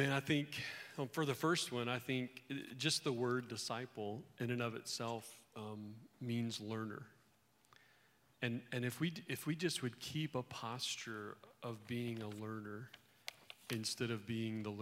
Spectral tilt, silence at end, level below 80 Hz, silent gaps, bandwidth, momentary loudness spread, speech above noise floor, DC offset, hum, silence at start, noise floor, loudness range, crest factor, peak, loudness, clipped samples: -4.5 dB/octave; 0 s; -82 dBFS; none; 16 kHz; 14 LU; 32 dB; under 0.1%; none; 0 s; -74 dBFS; 7 LU; 20 dB; -22 dBFS; -42 LUFS; under 0.1%